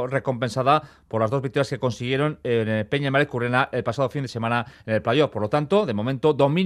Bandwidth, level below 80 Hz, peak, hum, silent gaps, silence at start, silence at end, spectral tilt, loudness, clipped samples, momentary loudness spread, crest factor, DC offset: 12.5 kHz; -58 dBFS; -4 dBFS; none; none; 0 s; 0 s; -6.5 dB/octave; -23 LUFS; under 0.1%; 5 LU; 18 dB; under 0.1%